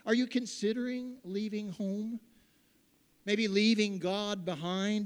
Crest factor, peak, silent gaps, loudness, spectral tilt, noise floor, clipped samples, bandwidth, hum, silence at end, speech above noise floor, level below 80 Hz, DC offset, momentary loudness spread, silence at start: 18 dB; -14 dBFS; none; -33 LUFS; -5 dB/octave; -69 dBFS; under 0.1%; 11.5 kHz; none; 0 s; 36 dB; -78 dBFS; under 0.1%; 12 LU; 0.05 s